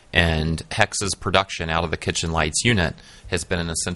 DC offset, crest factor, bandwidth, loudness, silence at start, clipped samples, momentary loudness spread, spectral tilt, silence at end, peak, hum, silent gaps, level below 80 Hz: under 0.1%; 22 dB; 11.5 kHz; -22 LUFS; 0.15 s; under 0.1%; 7 LU; -3.5 dB/octave; 0 s; 0 dBFS; none; none; -38 dBFS